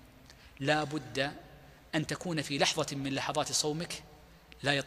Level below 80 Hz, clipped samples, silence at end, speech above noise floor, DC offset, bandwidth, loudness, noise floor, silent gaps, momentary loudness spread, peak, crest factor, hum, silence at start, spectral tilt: -62 dBFS; under 0.1%; 0 s; 23 dB; under 0.1%; 15.5 kHz; -33 LUFS; -56 dBFS; none; 8 LU; -10 dBFS; 24 dB; none; 0.05 s; -3.5 dB/octave